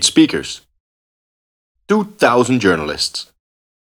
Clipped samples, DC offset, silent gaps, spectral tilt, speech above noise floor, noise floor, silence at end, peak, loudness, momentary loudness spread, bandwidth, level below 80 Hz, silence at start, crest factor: under 0.1%; under 0.1%; 0.80-1.75 s; -3.5 dB/octave; over 75 dB; under -90 dBFS; 0.65 s; 0 dBFS; -16 LUFS; 15 LU; 15 kHz; -50 dBFS; 0 s; 18 dB